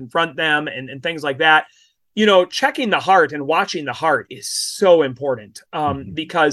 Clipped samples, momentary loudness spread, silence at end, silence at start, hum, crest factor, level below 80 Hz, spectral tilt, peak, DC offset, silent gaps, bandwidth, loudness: under 0.1%; 11 LU; 0 s; 0 s; none; 16 dB; -54 dBFS; -3.5 dB/octave; -2 dBFS; under 0.1%; none; 12.5 kHz; -18 LUFS